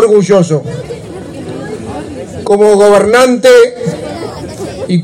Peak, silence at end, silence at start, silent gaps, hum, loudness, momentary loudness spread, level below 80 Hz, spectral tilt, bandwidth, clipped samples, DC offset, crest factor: 0 dBFS; 0 s; 0 s; none; none; -8 LUFS; 18 LU; -42 dBFS; -5.5 dB/octave; 15.5 kHz; 0.4%; under 0.1%; 10 dB